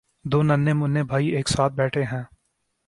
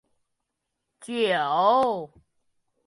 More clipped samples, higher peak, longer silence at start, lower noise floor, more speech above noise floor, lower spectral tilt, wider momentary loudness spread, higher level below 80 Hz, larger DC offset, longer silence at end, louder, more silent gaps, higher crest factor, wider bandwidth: neither; about the same, -6 dBFS vs -8 dBFS; second, 0.25 s vs 1 s; second, -73 dBFS vs -81 dBFS; second, 52 dB vs 58 dB; first, -6 dB/octave vs -4.5 dB/octave; second, 8 LU vs 13 LU; first, -50 dBFS vs -70 dBFS; neither; second, 0.6 s vs 0.8 s; about the same, -22 LUFS vs -24 LUFS; neither; about the same, 16 dB vs 18 dB; about the same, 11.5 kHz vs 11.5 kHz